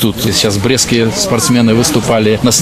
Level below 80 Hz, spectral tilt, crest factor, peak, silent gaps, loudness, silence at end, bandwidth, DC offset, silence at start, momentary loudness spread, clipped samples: -36 dBFS; -4 dB/octave; 10 dB; 0 dBFS; none; -10 LUFS; 0 s; 15 kHz; under 0.1%; 0 s; 2 LU; under 0.1%